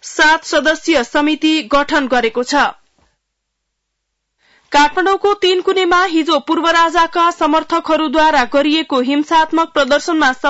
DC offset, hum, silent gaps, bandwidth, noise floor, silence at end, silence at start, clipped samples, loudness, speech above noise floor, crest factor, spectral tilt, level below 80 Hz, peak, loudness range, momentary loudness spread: under 0.1%; none; none; 8 kHz; -73 dBFS; 0 s; 0.05 s; under 0.1%; -13 LUFS; 60 dB; 12 dB; -2 dB/octave; -44 dBFS; -2 dBFS; 5 LU; 4 LU